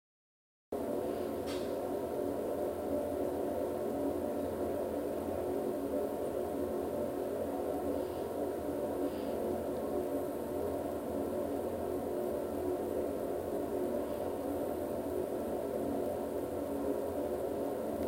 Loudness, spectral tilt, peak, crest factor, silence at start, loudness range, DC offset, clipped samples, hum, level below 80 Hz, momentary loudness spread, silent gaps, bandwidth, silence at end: -37 LUFS; -6.5 dB/octave; -22 dBFS; 14 dB; 0.7 s; 1 LU; under 0.1%; under 0.1%; none; -58 dBFS; 2 LU; none; 16 kHz; 0 s